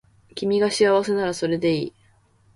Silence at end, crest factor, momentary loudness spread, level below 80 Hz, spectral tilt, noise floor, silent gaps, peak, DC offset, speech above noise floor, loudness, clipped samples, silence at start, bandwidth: 0.65 s; 16 dB; 12 LU; -60 dBFS; -5 dB/octave; -58 dBFS; none; -8 dBFS; under 0.1%; 38 dB; -22 LUFS; under 0.1%; 0.35 s; 11.5 kHz